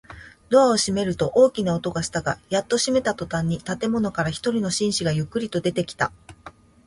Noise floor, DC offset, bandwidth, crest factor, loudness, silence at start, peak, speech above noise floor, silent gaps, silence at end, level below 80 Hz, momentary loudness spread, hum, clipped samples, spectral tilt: -47 dBFS; under 0.1%; 11.5 kHz; 18 dB; -23 LUFS; 0.1 s; -4 dBFS; 24 dB; none; 0.35 s; -50 dBFS; 8 LU; none; under 0.1%; -4.5 dB/octave